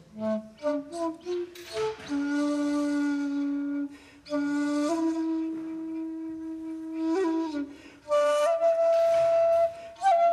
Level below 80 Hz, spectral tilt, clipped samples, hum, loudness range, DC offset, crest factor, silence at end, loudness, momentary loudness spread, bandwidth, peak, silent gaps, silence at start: -68 dBFS; -5 dB/octave; under 0.1%; none; 6 LU; under 0.1%; 12 dB; 0 s; -28 LUFS; 13 LU; 13.5 kHz; -14 dBFS; none; 0.15 s